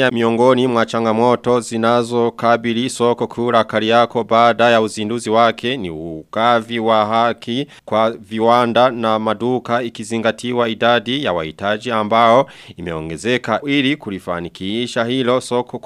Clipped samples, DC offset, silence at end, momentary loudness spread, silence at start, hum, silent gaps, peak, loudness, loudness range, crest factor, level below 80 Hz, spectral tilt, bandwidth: under 0.1%; under 0.1%; 0.05 s; 10 LU; 0 s; none; none; 0 dBFS; -16 LUFS; 2 LU; 16 dB; -54 dBFS; -5 dB/octave; 13 kHz